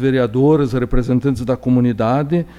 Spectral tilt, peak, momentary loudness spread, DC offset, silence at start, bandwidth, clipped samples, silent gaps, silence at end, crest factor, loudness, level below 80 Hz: -9 dB/octave; -2 dBFS; 5 LU; under 0.1%; 0 s; 11 kHz; under 0.1%; none; 0 s; 14 dB; -16 LUFS; -30 dBFS